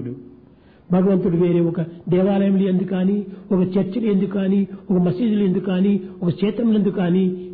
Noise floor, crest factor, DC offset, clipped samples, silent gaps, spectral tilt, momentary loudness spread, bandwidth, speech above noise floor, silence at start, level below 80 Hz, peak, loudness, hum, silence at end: -49 dBFS; 12 dB; under 0.1%; under 0.1%; none; -12.5 dB/octave; 5 LU; 4.5 kHz; 30 dB; 0 s; -54 dBFS; -8 dBFS; -19 LUFS; none; 0 s